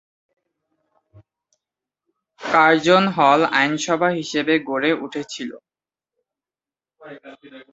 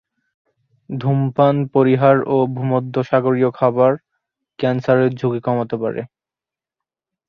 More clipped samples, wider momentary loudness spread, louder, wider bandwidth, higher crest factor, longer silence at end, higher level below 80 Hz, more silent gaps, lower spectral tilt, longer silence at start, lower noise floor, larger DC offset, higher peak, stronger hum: neither; first, 16 LU vs 10 LU; about the same, -18 LUFS vs -17 LUFS; first, 8 kHz vs 6.4 kHz; about the same, 20 dB vs 16 dB; second, 0.1 s vs 1.25 s; second, -66 dBFS vs -60 dBFS; neither; second, -4.5 dB/octave vs -9.5 dB/octave; first, 2.4 s vs 0.9 s; about the same, under -90 dBFS vs -89 dBFS; neither; about the same, -2 dBFS vs -2 dBFS; neither